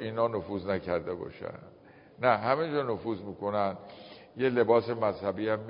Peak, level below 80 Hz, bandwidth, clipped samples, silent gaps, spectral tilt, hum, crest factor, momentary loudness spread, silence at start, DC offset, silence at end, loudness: -10 dBFS; -60 dBFS; 5.2 kHz; under 0.1%; none; -5 dB/octave; none; 20 dB; 17 LU; 0 s; under 0.1%; 0 s; -30 LUFS